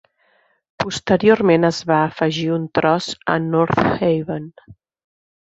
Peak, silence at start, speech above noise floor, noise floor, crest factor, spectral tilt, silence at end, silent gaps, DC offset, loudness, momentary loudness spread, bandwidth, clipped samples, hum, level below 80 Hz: -2 dBFS; 0.8 s; 43 dB; -61 dBFS; 18 dB; -6 dB/octave; 0.7 s; none; under 0.1%; -18 LUFS; 11 LU; 8 kHz; under 0.1%; none; -50 dBFS